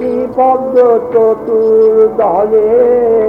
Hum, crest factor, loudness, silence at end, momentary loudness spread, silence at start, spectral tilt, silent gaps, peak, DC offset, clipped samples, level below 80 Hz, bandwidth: none; 10 dB; -10 LUFS; 0 s; 3 LU; 0 s; -8.5 dB/octave; none; 0 dBFS; under 0.1%; 0.1%; -46 dBFS; 3.3 kHz